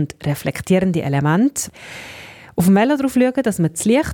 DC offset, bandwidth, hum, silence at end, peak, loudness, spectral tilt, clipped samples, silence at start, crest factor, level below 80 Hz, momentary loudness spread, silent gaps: under 0.1%; 18 kHz; none; 0 s; -4 dBFS; -18 LUFS; -6 dB/octave; under 0.1%; 0 s; 14 dB; -52 dBFS; 18 LU; none